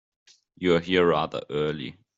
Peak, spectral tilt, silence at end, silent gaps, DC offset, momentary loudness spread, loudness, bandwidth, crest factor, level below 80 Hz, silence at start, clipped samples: -8 dBFS; -6.5 dB/octave; 0.25 s; none; under 0.1%; 8 LU; -25 LUFS; 7.8 kHz; 18 dB; -60 dBFS; 0.6 s; under 0.1%